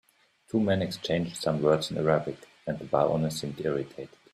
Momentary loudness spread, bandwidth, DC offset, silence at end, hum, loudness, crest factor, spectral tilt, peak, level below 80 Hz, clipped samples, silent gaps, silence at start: 12 LU; 13.5 kHz; under 0.1%; 0.25 s; none; -28 LUFS; 20 dB; -6 dB/octave; -8 dBFS; -60 dBFS; under 0.1%; none; 0.55 s